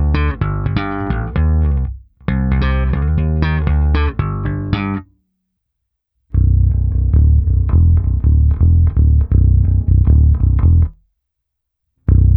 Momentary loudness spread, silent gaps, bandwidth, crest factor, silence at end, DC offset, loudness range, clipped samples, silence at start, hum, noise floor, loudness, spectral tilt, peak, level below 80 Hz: 8 LU; none; 5 kHz; 14 dB; 0 s; under 0.1%; 6 LU; under 0.1%; 0 s; none; -76 dBFS; -15 LUFS; -11 dB/octave; 0 dBFS; -16 dBFS